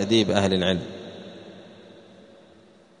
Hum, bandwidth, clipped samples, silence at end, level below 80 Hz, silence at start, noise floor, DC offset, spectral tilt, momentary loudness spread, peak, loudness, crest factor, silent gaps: none; 10 kHz; under 0.1%; 1.25 s; -60 dBFS; 0 s; -54 dBFS; under 0.1%; -5 dB/octave; 25 LU; -4 dBFS; -22 LUFS; 22 dB; none